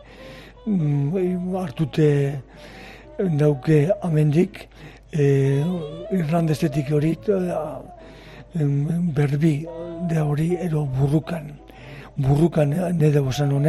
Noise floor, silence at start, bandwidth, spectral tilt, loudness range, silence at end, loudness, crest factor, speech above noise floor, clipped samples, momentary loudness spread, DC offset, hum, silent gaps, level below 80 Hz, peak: -42 dBFS; 0.1 s; 12.5 kHz; -8.5 dB/octave; 3 LU; 0 s; -22 LUFS; 14 dB; 21 dB; under 0.1%; 21 LU; under 0.1%; none; none; -46 dBFS; -6 dBFS